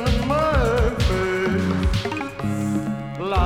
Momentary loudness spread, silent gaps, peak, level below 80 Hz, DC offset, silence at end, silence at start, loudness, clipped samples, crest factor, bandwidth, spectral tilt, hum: 7 LU; none; -6 dBFS; -28 dBFS; under 0.1%; 0 s; 0 s; -22 LUFS; under 0.1%; 14 dB; 16 kHz; -6.5 dB/octave; none